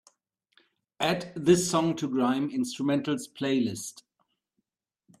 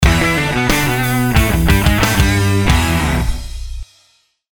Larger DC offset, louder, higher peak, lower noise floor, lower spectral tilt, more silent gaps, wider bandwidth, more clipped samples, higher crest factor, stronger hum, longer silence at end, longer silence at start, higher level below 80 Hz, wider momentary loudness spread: neither; second, -27 LUFS vs -14 LUFS; second, -10 dBFS vs 0 dBFS; first, -81 dBFS vs -56 dBFS; about the same, -5 dB/octave vs -5 dB/octave; neither; second, 14 kHz vs over 20 kHz; neither; first, 20 dB vs 14 dB; neither; first, 1.2 s vs 0.75 s; first, 1 s vs 0 s; second, -66 dBFS vs -20 dBFS; second, 9 LU vs 15 LU